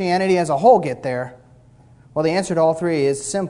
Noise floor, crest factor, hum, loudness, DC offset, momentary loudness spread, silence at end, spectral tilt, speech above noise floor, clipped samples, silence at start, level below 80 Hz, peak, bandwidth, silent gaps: -49 dBFS; 18 dB; none; -18 LUFS; under 0.1%; 12 LU; 0 s; -5.5 dB/octave; 31 dB; under 0.1%; 0 s; -56 dBFS; -2 dBFS; 11 kHz; none